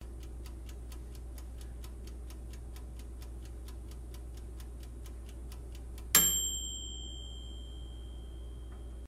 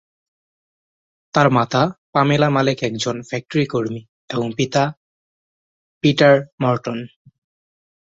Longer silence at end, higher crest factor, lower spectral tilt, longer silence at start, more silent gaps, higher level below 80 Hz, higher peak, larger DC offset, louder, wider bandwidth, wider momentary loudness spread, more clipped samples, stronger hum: second, 0 s vs 1.1 s; first, 32 dB vs 18 dB; second, -1.5 dB/octave vs -6 dB/octave; second, 0 s vs 1.35 s; second, none vs 1.98-2.13 s, 4.09-4.28 s, 4.97-6.01 s, 6.52-6.58 s; first, -44 dBFS vs -58 dBFS; second, -6 dBFS vs -2 dBFS; neither; second, -34 LUFS vs -19 LUFS; first, 16 kHz vs 7.8 kHz; first, 18 LU vs 13 LU; neither; neither